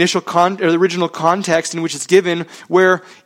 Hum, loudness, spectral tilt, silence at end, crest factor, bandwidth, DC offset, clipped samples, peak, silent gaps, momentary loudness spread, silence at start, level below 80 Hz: none; -15 LUFS; -4.5 dB/octave; 0.25 s; 16 dB; 14.5 kHz; under 0.1%; under 0.1%; 0 dBFS; none; 8 LU; 0 s; -62 dBFS